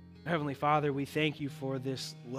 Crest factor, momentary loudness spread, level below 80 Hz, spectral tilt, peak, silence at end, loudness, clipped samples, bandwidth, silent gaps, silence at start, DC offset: 20 dB; 9 LU; -72 dBFS; -6 dB/octave; -14 dBFS; 0 s; -33 LUFS; under 0.1%; 15.5 kHz; none; 0 s; under 0.1%